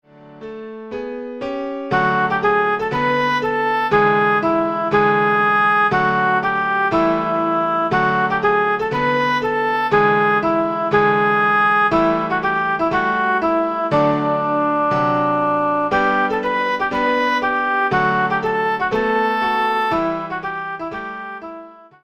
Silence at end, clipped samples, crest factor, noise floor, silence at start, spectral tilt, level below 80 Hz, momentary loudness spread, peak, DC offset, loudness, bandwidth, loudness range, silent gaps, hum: 0.25 s; under 0.1%; 16 dB; -38 dBFS; 0.2 s; -6.5 dB/octave; -50 dBFS; 11 LU; -2 dBFS; under 0.1%; -17 LUFS; 14.5 kHz; 3 LU; none; none